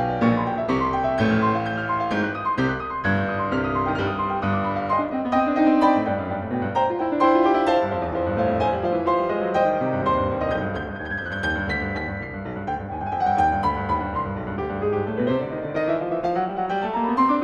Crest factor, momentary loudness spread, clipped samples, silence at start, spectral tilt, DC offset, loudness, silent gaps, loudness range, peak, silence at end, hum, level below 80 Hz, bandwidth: 18 dB; 9 LU; under 0.1%; 0 s; -7.5 dB/octave; under 0.1%; -23 LUFS; none; 4 LU; -6 dBFS; 0 s; none; -44 dBFS; 10.5 kHz